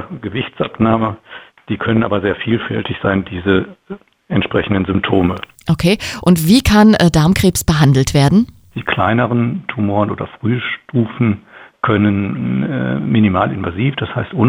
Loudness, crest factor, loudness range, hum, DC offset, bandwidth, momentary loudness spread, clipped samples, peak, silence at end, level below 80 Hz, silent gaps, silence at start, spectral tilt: -15 LUFS; 14 dB; 6 LU; none; under 0.1%; over 20 kHz; 11 LU; under 0.1%; 0 dBFS; 0 s; -36 dBFS; none; 0 s; -6 dB/octave